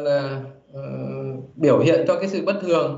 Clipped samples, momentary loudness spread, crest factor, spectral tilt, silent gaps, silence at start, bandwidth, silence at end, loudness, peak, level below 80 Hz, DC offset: under 0.1%; 16 LU; 16 dB; -7 dB/octave; none; 0 s; 7.8 kHz; 0 s; -21 LUFS; -6 dBFS; -66 dBFS; under 0.1%